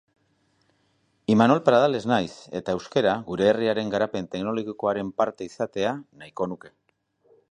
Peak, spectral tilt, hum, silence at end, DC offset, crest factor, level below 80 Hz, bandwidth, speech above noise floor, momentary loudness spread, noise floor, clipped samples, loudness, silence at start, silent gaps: -2 dBFS; -6.5 dB/octave; none; 0.8 s; under 0.1%; 22 dB; -62 dBFS; 10 kHz; 44 dB; 13 LU; -68 dBFS; under 0.1%; -24 LUFS; 1.3 s; none